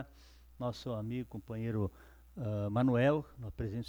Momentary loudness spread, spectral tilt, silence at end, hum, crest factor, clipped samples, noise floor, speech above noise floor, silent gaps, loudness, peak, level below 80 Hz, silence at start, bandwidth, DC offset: 14 LU; -8.5 dB/octave; 0 s; none; 16 dB; under 0.1%; -58 dBFS; 24 dB; none; -36 LUFS; -20 dBFS; -56 dBFS; 0 s; over 20 kHz; under 0.1%